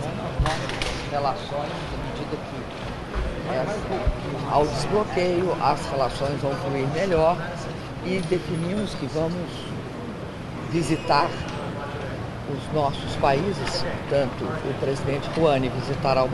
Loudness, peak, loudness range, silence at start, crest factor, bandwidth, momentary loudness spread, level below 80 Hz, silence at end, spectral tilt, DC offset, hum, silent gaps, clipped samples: -26 LUFS; -6 dBFS; 5 LU; 0 s; 20 dB; 12.5 kHz; 10 LU; -38 dBFS; 0 s; -6 dB/octave; under 0.1%; none; none; under 0.1%